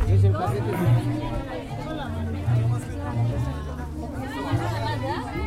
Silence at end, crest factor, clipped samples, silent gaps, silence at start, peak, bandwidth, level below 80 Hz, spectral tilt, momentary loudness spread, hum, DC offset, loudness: 0 s; 14 dB; under 0.1%; none; 0 s; -10 dBFS; 13.5 kHz; -36 dBFS; -7.5 dB/octave; 10 LU; none; under 0.1%; -26 LUFS